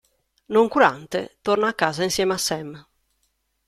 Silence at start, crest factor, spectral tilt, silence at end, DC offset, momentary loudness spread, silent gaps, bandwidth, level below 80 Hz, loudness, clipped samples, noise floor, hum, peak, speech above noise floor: 0.5 s; 20 dB; -3.5 dB/octave; 0.85 s; under 0.1%; 11 LU; none; 15 kHz; -58 dBFS; -21 LUFS; under 0.1%; -71 dBFS; none; -2 dBFS; 49 dB